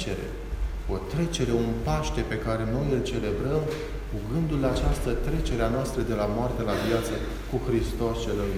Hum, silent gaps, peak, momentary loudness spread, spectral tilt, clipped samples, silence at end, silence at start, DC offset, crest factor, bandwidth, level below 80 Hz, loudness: none; none; -10 dBFS; 7 LU; -6.5 dB/octave; under 0.1%; 0 s; 0 s; under 0.1%; 16 dB; 16 kHz; -34 dBFS; -28 LUFS